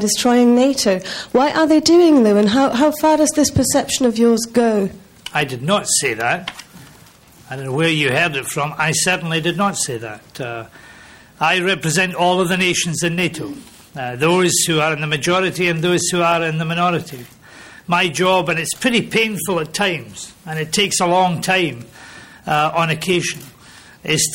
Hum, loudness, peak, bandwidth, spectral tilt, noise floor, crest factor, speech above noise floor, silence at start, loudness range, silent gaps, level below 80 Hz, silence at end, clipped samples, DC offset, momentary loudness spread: none; -16 LUFS; -2 dBFS; 16.5 kHz; -3.5 dB/octave; -46 dBFS; 16 dB; 29 dB; 0 s; 5 LU; none; -50 dBFS; 0 s; under 0.1%; under 0.1%; 15 LU